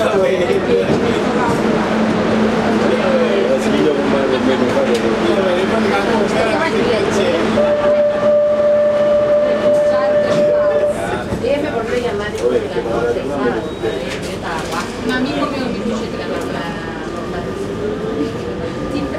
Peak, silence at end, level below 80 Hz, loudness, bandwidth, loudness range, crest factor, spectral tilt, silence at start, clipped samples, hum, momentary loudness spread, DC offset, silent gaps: -2 dBFS; 0 s; -40 dBFS; -16 LUFS; 13.5 kHz; 7 LU; 14 dB; -5.5 dB/octave; 0 s; under 0.1%; none; 9 LU; under 0.1%; none